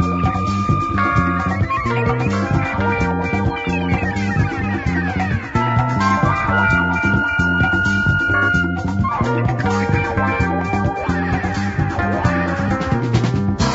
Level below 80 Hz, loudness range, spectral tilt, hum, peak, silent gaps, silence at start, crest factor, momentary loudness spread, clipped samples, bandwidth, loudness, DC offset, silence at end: -32 dBFS; 3 LU; -7 dB/octave; none; -4 dBFS; none; 0 s; 14 dB; 4 LU; under 0.1%; 8 kHz; -18 LUFS; under 0.1%; 0 s